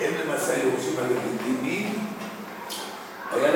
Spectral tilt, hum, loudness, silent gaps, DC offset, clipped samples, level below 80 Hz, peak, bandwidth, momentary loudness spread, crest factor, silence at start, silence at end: -4 dB/octave; none; -28 LUFS; none; under 0.1%; under 0.1%; -70 dBFS; -8 dBFS; 19 kHz; 11 LU; 18 dB; 0 s; 0 s